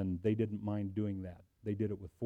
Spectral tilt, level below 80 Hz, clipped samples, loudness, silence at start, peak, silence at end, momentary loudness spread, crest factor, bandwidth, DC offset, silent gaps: -10.5 dB/octave; -64 dBFS; under 0.1%; -38 LUFS; 0 s; -20 dBFS; 0 s; 10 LU; 16 dB; 4 kHz; under 0.1%; none